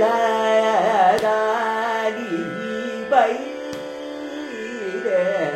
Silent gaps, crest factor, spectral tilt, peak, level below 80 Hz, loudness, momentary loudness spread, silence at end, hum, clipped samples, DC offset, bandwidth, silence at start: none; 18 dB; -4.5 dB/octave; -4 dBFS; -64 dBFS; -21 LUFS; 14 LU; 0 s; none; under 0.1%; under 0.1%; 14.5 kHz; 0 s